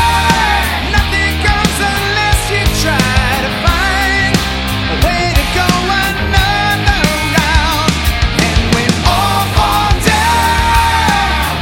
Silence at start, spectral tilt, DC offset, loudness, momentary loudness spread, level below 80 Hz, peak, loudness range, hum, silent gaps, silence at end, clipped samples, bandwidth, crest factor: 0 s; -4 dB/octave; under 0.1%; -12 LUFS; 3 LU; -18 dBFS; 0 dBFS; 1 LU; none; none; 0 s; under 0.1%; 17.5 kHz; 12 dB